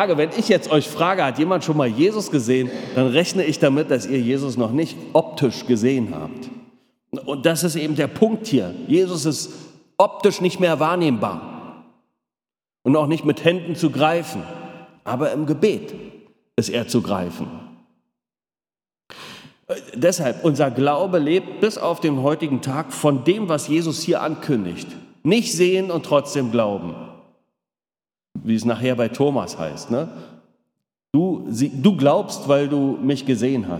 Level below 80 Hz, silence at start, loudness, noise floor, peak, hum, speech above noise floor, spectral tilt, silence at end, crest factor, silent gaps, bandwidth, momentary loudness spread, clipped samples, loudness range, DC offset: -66 dBFS; 0 s; -20 LUFS; under -90 dBFS; 0 dBFS; none; over 70 dB; -5.5 dB/octave; 0 s; 20 dB; none; 18 kHz; 14 LU; under 0.1%; 5 LU; under 0.1%